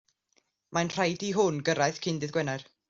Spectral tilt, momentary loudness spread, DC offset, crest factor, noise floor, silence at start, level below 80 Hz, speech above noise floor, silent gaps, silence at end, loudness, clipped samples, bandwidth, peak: -4.5 dB/octave; 6 LU; under 0.1%; 18 dB; -73 dBFS; 0.7 s; -68 dBFS; 44 dB; none; 0.25 s; -29 LUFS; under 0.1%; 7.8 kHz; -12 dBFS